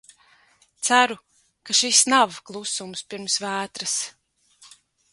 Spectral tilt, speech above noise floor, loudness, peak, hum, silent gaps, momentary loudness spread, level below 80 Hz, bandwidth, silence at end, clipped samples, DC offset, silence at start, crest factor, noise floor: 0 dB/octave; 37 dB; -21 LUFS; -2 dBFS; none; none; 16 LU; -72 dBFS; 11.5 kHz; 0.45 s; under 0.1%; under 0.1%; 0.8 s; 22 dB; -59 dBFS